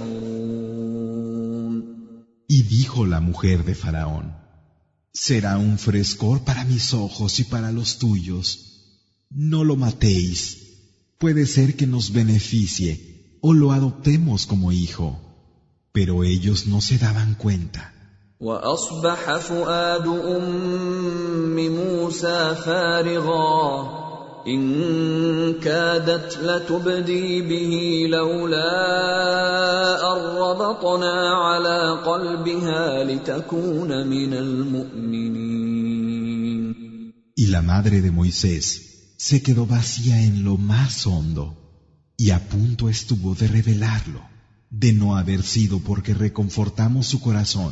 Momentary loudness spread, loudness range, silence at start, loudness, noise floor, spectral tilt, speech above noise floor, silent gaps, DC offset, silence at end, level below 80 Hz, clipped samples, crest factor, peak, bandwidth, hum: 9 LU; 4 LU; 0 s; -21 LUFS; -62 dBFS; -5.5 dB/octave; 42 dB; none; under 0.1%; 0 s; -40 dBFS; under 0.1%; 16 dB; -4 dBFS; 8 kHz; none